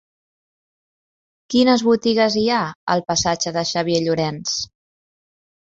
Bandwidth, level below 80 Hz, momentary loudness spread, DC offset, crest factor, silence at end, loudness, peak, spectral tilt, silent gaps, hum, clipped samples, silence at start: 8 kHz; -54 dBFS; 7 LU; under 0.1%; 18 dB; 1 s; -19 LUFS; -4 dBFS; -4 dB/octave; 2.75-2.87 s; none; under 0.1%; 1.5 s